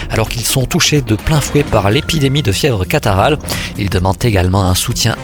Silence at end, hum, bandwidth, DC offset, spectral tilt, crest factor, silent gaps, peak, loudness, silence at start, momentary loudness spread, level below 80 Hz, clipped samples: 0 s; none; 19.5 kHz; under 0.1%; -4.5 dB/octave; 14 dB; none; 0 dBFS; -13 LUFS; 0 s; 4 LU; -28 dBFS; under 0.1%